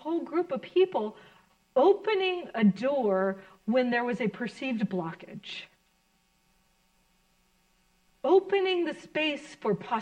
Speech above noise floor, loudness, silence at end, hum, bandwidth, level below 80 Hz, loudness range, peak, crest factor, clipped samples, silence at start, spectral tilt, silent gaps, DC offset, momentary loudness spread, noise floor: 42 dB; -28 LUFS; 0 s; none; 9.2 kHz; -72 dBFS; 11 LU; -12 dBFS; 18 dB; under 0.1%; 0.05 s; -6.5 dB/octave; none; under 0.1%; 14 LU; -69 dBFS